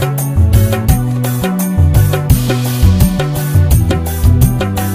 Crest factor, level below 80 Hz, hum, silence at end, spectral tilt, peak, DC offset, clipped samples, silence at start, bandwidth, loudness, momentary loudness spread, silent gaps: 10 dB; -18 dBFS; none; 0 s; -6.5 dB/octave; 0 dBFS; under 0.1%; under 0.1%; 0 s; 16 kHz; -12 LUFS; 5 LU; none